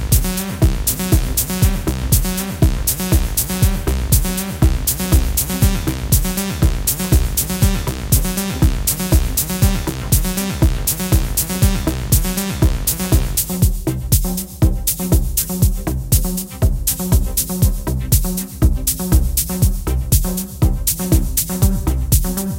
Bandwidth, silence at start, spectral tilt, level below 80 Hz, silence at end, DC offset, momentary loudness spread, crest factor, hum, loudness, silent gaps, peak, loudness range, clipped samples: 17.5 kHz; 0 s; -4.5 dB/octave; -20 dBFS; 0 s; under 0.1%; 4 LU; 16 dB; none; -17 LUFS; none; 0 dBFS; 1 LU; under 0.1%